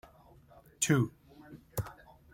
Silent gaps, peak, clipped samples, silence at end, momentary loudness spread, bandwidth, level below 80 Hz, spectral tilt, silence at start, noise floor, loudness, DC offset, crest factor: none; -14 dBFS; under 0.1%; 0.4 s; 23 LU; 16.5 kHz; -60 dBFS; -4.5 dB/octave; 0.8 s; -59 dBFS; -33 LUFS; under 0.1%; 22 dB